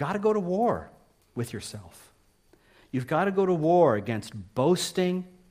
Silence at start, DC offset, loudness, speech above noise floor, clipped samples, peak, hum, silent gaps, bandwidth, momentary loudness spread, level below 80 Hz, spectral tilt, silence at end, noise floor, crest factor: 0 s; under 0.1%; -26 LUFS; 36 dB; under 0.1%; -8 dBFS; none; none; 15.5 kHz; 14 LU; -62 dBFS; -6 dB/octave; 0.2 s; -62 dBFS; 18 dB